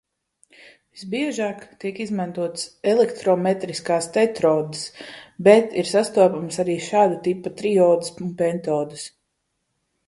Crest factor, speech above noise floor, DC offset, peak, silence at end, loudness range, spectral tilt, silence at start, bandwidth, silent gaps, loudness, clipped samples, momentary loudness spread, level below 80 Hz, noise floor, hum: 22 dB; 54 dB; under 0.1%; 0 dBFS; 1 s; 5 LU; -5 dB/octave; 0.95 s; 11.5 kHz; none; -21 LUFS; under 0.1%; 14 LU; -66 dBFS; -75 dBFS; none